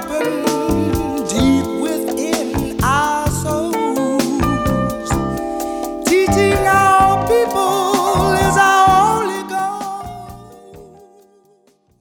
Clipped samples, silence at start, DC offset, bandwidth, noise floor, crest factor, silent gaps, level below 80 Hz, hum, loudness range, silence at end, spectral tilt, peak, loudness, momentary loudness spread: under 0.1%; 0 s; under 0.1%; 20 kHz; -55 dBFS; 16 dB; none; -34 dBFS; none; 5 LU; 1.15 s; -5 dB/octave; 0 dBFS; -16 LUFS; 11 LU